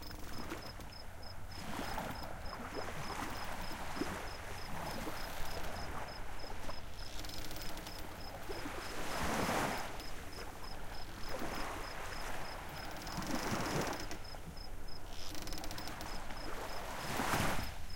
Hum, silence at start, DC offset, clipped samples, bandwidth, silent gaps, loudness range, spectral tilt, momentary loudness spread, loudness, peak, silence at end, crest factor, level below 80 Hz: none; 0 s; under 0.1%; under 0.1%; 17 kHz; none; 4 LU; -4 dB/octave; 11 LU; -43 LUFS; -20 dBFS; 0 s; 20 dB; -48 dBFS